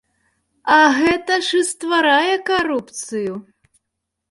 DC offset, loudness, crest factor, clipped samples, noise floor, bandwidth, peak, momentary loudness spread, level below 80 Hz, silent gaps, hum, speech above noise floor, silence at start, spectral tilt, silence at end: under 0.1%; -17 LUFS; 16 dB; under 0.1%; -78 dBFS; 11.5 kHz; -2 dBFS; 14 LU; -56 dBFS; none; none; 61 dB; 0.65 s; -2.5 dB/octave; 0.9 s